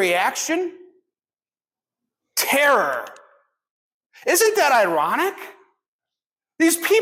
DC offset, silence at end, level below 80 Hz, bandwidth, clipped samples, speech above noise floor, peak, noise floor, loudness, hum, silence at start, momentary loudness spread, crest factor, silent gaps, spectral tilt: under 0.1%; 0 s; -76 dBFS; 16.5 kHz; under 0.1%; over 71 dB; -6 dBFS; under -90 dBFS; -19 LUFS; none; 0 s; 14 LU; 16 dB; 3.70-4.10 s, 5.88-5.99 s, 6.26-6.30 s; -1.5 dB/octave